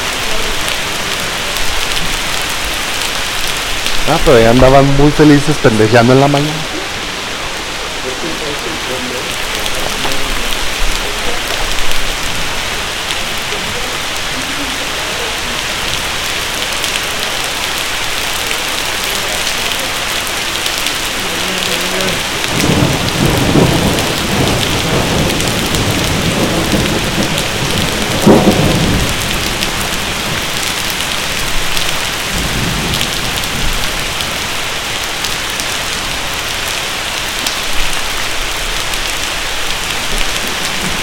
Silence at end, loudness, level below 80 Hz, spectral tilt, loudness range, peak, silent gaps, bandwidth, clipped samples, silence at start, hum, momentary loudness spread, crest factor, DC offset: 0 s; -14 LUFS; -26 dBFS; -3.5 dB/octave; 6 LU; 0 dBFS; none; 17.5 kHz; 0.2%; 0 s; none; 7 LU; 14 dB; under 0.1%